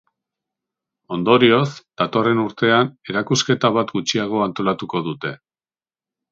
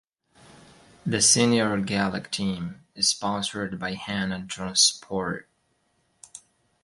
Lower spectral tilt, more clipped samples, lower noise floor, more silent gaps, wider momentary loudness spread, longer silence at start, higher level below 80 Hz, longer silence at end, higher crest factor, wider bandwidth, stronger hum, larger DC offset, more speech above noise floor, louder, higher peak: first, -5 dB/octave vs -2.5 dB/octave; neither; first, under -90 dBFS vs -70 dBFS; neither; second, 11 LU vs 17 LU; about the same, 1.1 s vs 1.05 s; about the same, -62 dBFS vs -58 dBFS; first, 0.95 s vs 0.45 s; about the same, 20 dB vs 22 dB; second, 7.8 kHz vs 11.5 kHz; neither; neither; first, over 71 dB vs 45 dB; first, -19 LUFS vs -24 LUFS; first, 0 dBFS vs -6 dBFS